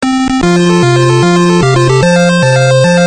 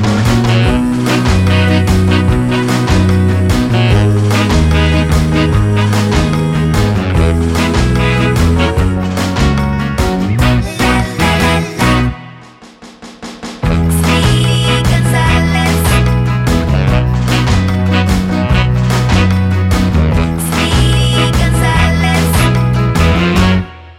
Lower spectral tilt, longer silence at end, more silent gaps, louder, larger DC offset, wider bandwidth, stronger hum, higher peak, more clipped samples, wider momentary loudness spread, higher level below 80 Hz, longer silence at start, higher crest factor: about the same, -5.5 dB/octave vs -6 dB/octave; about the same, 0 s vs 0.05 s; neither; first, -8 LUFS vs -12 LUFS; first, 0.7% vs under 0.1%; second, 9.6 kHz vs 16 kHz; neither; about the same, 0 dBFS vs 0 dBFS; first, 0.5% vs under 0.1%; about the same, 2 LU vs 3 LU; second, -34 dBFS vs -20 dBFS; about the same, 0 s vs 0 s; about the same, 8 dB vs 10 dB